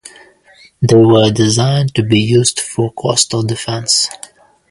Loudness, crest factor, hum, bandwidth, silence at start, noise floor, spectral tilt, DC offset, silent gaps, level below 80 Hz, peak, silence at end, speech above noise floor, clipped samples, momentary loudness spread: -12 LUFS; 14 dB; none; 11.5 kHz; 0.05 s; -46 dBFS; -4.5 dB/octave; under 0.1%; none; -46 dBFS; 0 dBFS; 0.55 s; 34 dB; under 0.1%; 9 LU